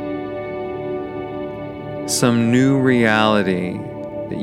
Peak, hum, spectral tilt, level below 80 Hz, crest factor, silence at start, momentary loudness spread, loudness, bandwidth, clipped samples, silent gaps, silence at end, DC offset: 0 dBFS; none; -5 dB/octave; -50 dBFS; 18 dB; 0 s; 14 LU; -19 LUFS; 15.5 kHz; under 0.1%; none; 0 s; under 0.1%